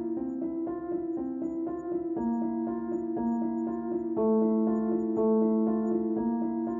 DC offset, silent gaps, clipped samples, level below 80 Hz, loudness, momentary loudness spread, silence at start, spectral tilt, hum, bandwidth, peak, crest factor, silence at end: under 0.1%; none; under 0.1%; -62 dBFS; -30 LUFS; 8 LU; 0 s; -12 dB/octave; none; 2.1 kHz; -16 dBFS; 12 dB; 0 s